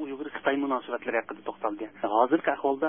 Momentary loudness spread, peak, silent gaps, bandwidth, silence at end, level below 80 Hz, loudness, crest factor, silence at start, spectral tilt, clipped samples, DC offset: 10 LU; -8 dBFS; none; 3.7 kHz; 0 s; -72 dBFS; -29 LUFS; 20 dB; 0 s; -9 dB/octave; under 0.1%; under 0.1%